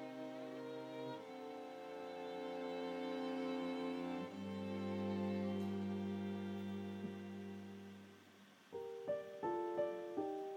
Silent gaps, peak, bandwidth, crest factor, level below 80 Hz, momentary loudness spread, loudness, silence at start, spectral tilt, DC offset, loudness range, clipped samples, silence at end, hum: none; -28 dBFS; 16 kHz; 16 dB; under -90 dBFS; 10 LU; -45 LUFS; 0 s; -7 dB/octave; under 0.1%; 5 LU; under 0.1%; 0 s; none